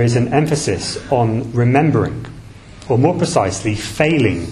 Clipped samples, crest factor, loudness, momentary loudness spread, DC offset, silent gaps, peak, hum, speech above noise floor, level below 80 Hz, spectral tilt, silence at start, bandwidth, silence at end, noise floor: under 0.1%; 16 dB; -16 LUFS; 8 LU; under 0.1%; none; 0 dBFS; none; 21 dB; -42 dBFS; -6 dB/octave; 0 s; 13 kHz; 0 s; -36 dBFS